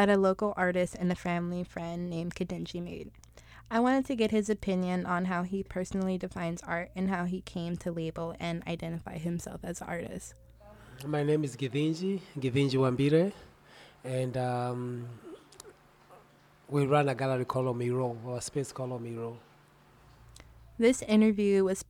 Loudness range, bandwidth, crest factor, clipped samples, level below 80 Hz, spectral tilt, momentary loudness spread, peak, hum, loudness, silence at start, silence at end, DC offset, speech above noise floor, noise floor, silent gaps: 6 LU; 16 kHz; 20 dB; under 0.1%; -58 dBFS; -6.5 dB/octave; 14 LU; -12 dBFS; none; -31 LUFS; 0 s; 0.05 s; under 0.1%; 30 dB; -60 dBFS; none